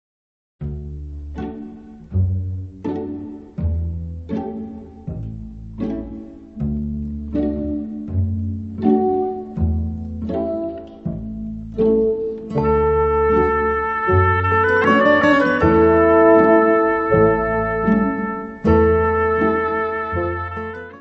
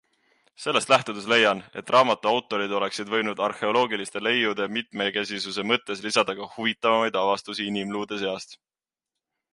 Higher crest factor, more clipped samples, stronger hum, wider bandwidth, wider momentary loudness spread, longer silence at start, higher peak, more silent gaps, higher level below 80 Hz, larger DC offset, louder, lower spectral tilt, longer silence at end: about the same, 16 dB vs 20 dB; neither; neither; second, 6.4 kHz vs 11.5 kHz; first, 17 LU vs 9 LU; about the same, 0.6 s vs 0.6 s; first, -2 dBFS vs -6 dBFS; neither; first, -34 dBFS vs -72 dBFS; neither; first, -18 LUFS vs -24 LUFS; first, -9 dB/octave vs -3 dB/octave; second, 0 s vs 1 s